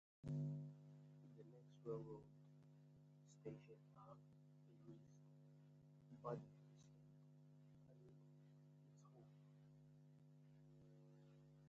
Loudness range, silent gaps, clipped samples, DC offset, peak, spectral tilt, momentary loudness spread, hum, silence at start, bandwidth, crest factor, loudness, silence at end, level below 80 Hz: 11 LU; none; under 0.1%; under 0.1%; -36 dBFS; -9.5 dB/octave; 16 LU; 50 Hz at -75 dBFS; 0.25 s; 7.6 kHz; 22 dB; -60 LUFS; 0 s; -86 dBFS